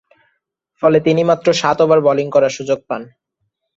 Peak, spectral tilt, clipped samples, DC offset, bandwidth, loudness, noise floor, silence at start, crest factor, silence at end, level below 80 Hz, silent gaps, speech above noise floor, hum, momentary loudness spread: -2 dBFS; -5.5 dB/octave; under 0.1%; under 0.1%; 8 kHz; -15 LUFS; -72 dBFS; 0.8 s; 14 dB; 0.7 s; -58 dBFS; none; 58 dB; none; 9 LU